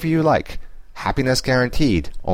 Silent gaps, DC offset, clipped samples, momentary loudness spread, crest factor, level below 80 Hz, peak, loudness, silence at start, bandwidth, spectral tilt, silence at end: none; under 0.1%; under 0.1%; 11 LU; 14 dB; -32 dBFS; -6 dBFS; -19 LUFS; 0 s; 16 kHz; -5.5 dB/octave; 0 s